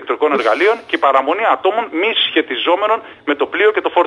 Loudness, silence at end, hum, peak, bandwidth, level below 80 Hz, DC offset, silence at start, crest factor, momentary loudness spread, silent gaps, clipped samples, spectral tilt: -15 LUFS; 0 s; none; 0 dBFS; 10.5 kHz; -66 dBFS; under 0.1%; 0 s; 16 dB; 5 LU; none; under 0.1%; -3.5 dB/octave